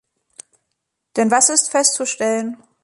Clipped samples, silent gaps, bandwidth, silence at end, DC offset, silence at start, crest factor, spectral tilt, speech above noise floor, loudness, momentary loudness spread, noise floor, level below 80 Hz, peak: under 0.1%; none; 11.5 kHz; 0.3 s; under 0.1%; 1.15 s; 20 dB; -1.5 dB/octave; 58 dB; -16 LUFS; 12 LU; -76 dBFS; -70 dBFS; 0 dBFS